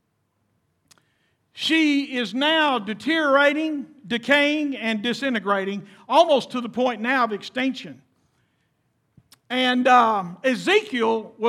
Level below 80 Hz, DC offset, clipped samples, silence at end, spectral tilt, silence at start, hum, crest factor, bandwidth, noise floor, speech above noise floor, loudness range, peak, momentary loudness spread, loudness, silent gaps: -76 dBFS; under 0.1%; under 0.1%; 0 s; -4 dB/octave; 1.55 s; none; 20 dB; 14 kHz; -71 dBFS; 50 dB; 3 LU; -4 dBFS; 11 LU; -21 LUFS; none